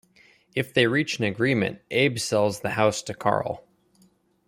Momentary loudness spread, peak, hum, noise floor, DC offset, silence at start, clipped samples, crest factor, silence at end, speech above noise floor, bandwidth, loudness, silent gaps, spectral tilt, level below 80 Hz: 8 LU; -6 dBFS; none; -62 dBFS; under 0.1%; 0.55 s; under 0.1%; 20 dB; 0.9 s; 38 dB; 16 kHz; -24 LUFS; none; -4.5 dB/octave; -62 dBFS